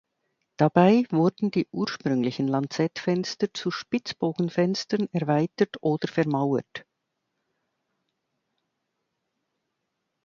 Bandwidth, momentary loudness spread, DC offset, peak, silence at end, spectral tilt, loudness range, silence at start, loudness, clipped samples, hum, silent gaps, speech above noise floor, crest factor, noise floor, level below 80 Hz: 7.4 kHz; 9 LU; under 0.1%; -4 dBFS; 3.45 s; -6.5 dB/octave; 7 LU; 0.6 s; -25 LUFS; under 0.1%; none; none; 56 dB; 22 dB; -80 dBFS; -70 dBFS